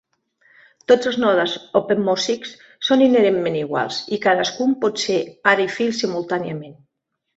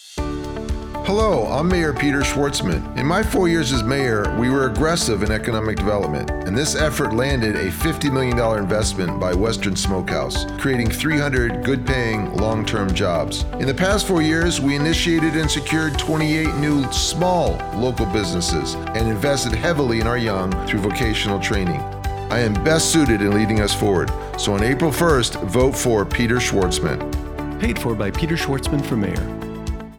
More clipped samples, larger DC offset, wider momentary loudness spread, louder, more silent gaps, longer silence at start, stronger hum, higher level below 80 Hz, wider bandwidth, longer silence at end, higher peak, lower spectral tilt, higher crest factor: neither; neither; first, 9 LU vs 6 LU; about the same, -19 LUFS vs -20 LUFS; neither; first, 0.9 s vs 0 s; neither; second, -64 dBFS vs -30 dBFS; second, 8 kHz vs 19 kHz; first, 0.65 s vs 0 s; about the same, -2 dBFS vs -4 dBFS; about the same, -4 dB/octave vs -5 dB/octave; about the same, 18 dB vs 16 dB